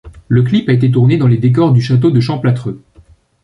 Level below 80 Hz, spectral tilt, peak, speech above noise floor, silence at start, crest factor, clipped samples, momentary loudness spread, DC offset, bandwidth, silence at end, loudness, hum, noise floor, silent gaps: -44 dBFS; -9 dB/octave; -2 dBFS; 35 dB; 0.05 s; 10 dB; under 0.1%; 7 LU; under 0.1%; 6.2 kHz; 0.65 s; -12 LUFS; none; -45 dBFS; none